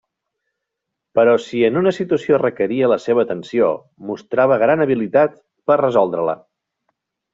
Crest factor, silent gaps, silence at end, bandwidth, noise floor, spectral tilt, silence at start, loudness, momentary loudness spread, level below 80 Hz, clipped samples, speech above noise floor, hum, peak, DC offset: 16 dB; none; 1 s; 7.8 kHz; -80 dBFS; -7 dB/octave; 1.15 s; -17 LUFS; 8 LU; -62 dBFS; under 0.1%; 64 dB; none; -2 dBFS; under 0.1%